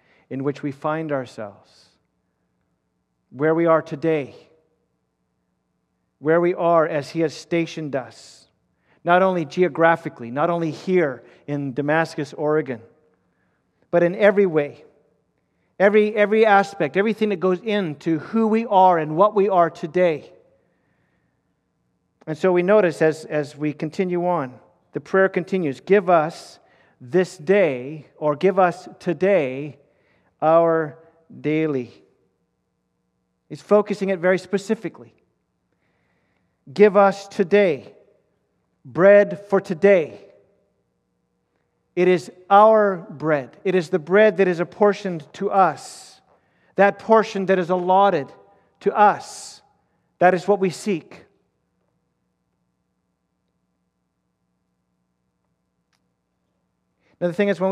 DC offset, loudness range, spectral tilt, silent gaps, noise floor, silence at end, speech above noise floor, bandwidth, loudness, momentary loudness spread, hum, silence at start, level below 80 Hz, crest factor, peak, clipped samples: under 0.1%; 6 LU; -6.5 dB/octave; none; -73 dBFS; 0 s; 54 dB; 11.5 kHz; -20 LUFS; 14 LU; none; 0.3 s; -74 dBFS; 20 dB; -2 dBFS; under 0.1%